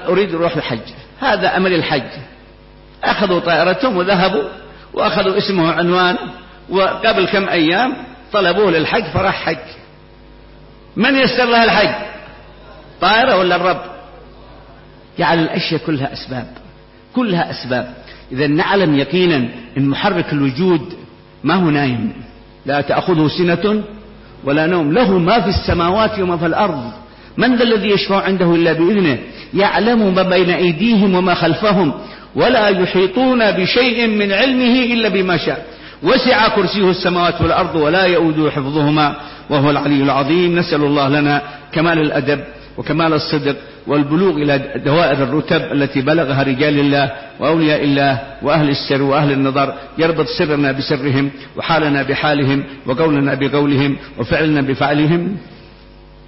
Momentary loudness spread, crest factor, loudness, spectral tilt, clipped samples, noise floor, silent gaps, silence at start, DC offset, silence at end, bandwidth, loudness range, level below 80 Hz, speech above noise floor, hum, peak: 10 LU; 14 dB; -15 LUFS; -9.5 dB/octave; under 0.1%; -41 dBFS; none; 0 s; under 0.1%; 0.7 s; 5.8 kHz; 4 LU; -42 dBFS; 27 dB; none; -2 dBFS